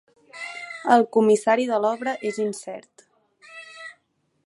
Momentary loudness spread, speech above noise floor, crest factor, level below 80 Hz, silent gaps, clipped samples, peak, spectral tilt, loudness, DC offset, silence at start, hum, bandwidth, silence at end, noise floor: 22 LU; 49 dB; 22 dB; -78 dBFS; none; under 0.1%; -2 dBFS; -4.5 dB/octave; -22 LUFS; under 0.1%; 0.35 s; none; 11.5 kHz; 0.55 s; -70 dBFS